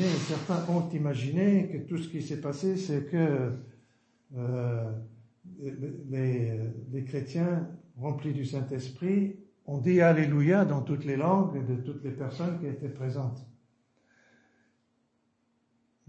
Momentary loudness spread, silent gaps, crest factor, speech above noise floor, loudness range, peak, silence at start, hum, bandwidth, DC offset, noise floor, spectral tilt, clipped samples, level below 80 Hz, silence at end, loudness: 13 LU; none; 20 dB; 44 dB; 10 LU; -12 dBFS; 0 s; none; 8.6 kHz; under 0.1%; -74 dBFS; -8 dB/octave; under 0.1%; -72 dBFS; 2.55 s; -30 LUFS